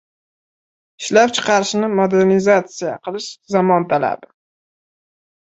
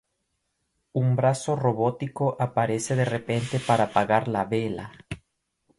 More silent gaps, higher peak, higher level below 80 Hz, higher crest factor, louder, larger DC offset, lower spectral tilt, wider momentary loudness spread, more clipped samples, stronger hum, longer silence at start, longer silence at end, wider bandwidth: neither; first, -2 dBFS vs -6 dBFS; about the same, -62 dBFS vs -58 dBFS; about the same, 16 dB vs 20 dB; first, -16 LUFS vs -25 LUFS; neither; second, -4.5 dB/octave vs -6 dB/octave; about the same, 12 LU vs 12 LU; neither; neither; about the same, 1 s vs 0.95 s; first, 1.25 s vs 0.65 s; second, 8.2 kHz vs 11.5 kHz